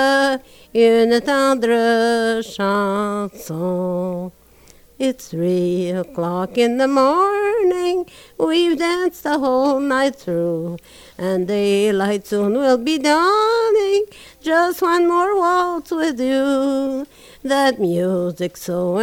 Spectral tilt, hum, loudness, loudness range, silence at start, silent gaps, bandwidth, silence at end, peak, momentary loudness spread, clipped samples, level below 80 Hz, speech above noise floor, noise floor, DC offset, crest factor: -5 dB/octave; none; -18 LUFS; 5 LU; 0 s; none; 19 kHz; 0 s; -4 dBFS; 9 LU; under 0.1%; -54 dBFS; 30 dB; -48 dBFS; under 0.1%; 14 dB